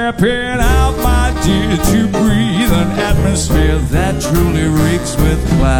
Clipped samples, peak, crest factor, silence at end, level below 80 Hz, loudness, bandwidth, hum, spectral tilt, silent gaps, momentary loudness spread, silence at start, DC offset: under 0.1%; -2 dBFS; 10 dB; 0 s; -18 dBFS; -13 LUFS; 17.5 kHz; none; -5.5 dB/octave; none; 2 LU; 0 s; under 0.1%